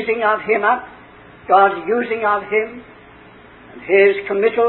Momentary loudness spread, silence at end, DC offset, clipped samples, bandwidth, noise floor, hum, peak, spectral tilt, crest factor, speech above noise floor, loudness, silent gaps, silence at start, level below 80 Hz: 14 LU; 0 s; under 0.1%; under 0.1%; 4.2 kHz; -43 dBFS; none; 0 dBFS; -9.5 dB/octave; 18 dB; 26 dB; -16 LUFS; none; 0 s; -56 dBFS